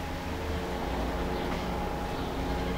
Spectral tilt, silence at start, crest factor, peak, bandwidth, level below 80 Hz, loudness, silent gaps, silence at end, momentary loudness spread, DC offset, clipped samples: -6 dB/octave; 0 s; 12 dB; -20 dBFS; 16 kHz; -38 dBFS; -33 LUFS; none; 0 s; 2 LU; under 0.1%; under 0.1%